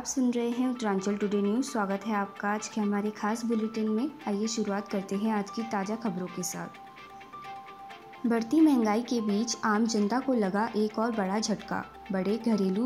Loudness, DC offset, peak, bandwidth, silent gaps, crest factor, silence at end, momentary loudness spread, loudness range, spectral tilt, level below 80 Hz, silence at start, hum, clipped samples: -29 LUFS; under 0.1%; -14 dBFS; 15.5 kHz; none; 16 dB; 0 s; 15 LU; 6 LU; -5 dB/octave; -68 dBFS; 0 s; none; under 0.1%